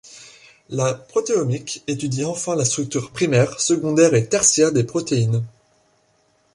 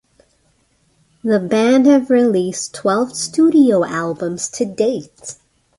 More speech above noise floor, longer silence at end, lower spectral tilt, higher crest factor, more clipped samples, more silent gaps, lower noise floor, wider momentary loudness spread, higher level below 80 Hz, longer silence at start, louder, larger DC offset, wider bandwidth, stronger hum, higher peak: about the same, 42 dB vs 45 dB; first, 1.05 s vs 0.45 s; about the same, -4.5 dB/octave vs -5 dB/octave; about the same, 18 dB vs 14 dB; neither; neither; about the same, -62 dBFS vs -60 dBFS; second, 10 LU vs 13 LU; about the same, -56 dBFS vs -60 dBFS; second, 0.1 s vs 1.25 s; second, -19 LUFS vs -16 LUFS; neither; about the same, 11.5 kHz vs 11.5 kHz; neither; about the same, -2 dBFS vs -2 dBFS